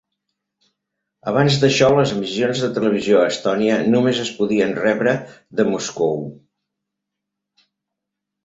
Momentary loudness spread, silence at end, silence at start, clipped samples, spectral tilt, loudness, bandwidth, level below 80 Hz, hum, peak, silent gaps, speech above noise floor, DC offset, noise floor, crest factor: 7 LU; 2.1 s; 1.25 s; under 0.1%; -5.5 dB/octave; -18 LUFS; 8 kHz; -56 dBFS; none; -2 dBFS; none; 64 dB; under 0.1%; -82 dBFS; 18 dB